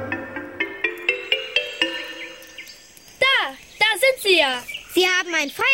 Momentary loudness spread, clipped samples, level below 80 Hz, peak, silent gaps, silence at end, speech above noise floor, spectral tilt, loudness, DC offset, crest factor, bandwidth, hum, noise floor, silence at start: 18 LU; under 0.1%; -60 dBFS; -4 dBFS; none; 0 s; 27 dB; -1.5 dB/octave; -20 LUFS; under 0.1%; 18 dB; 16.5 kHz; none; -46 dBFS; 0 s